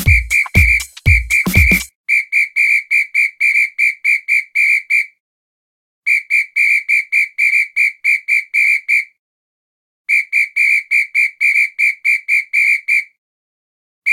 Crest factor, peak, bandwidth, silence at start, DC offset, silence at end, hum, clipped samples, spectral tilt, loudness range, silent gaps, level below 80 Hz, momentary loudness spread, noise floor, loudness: 16 dB; 0 dBFS; 17 kHz; 0 s; under 0.1%; 0 s; none; under 0.1%; -3.5 dB/octave; 2 LU; 1.95-2.04 s, 5.20-6.02 s, 9.19-10.05 s, 13.18-14.02 s; -28 dBFS; 4 LU; under -90 dBFS; -12 LUFS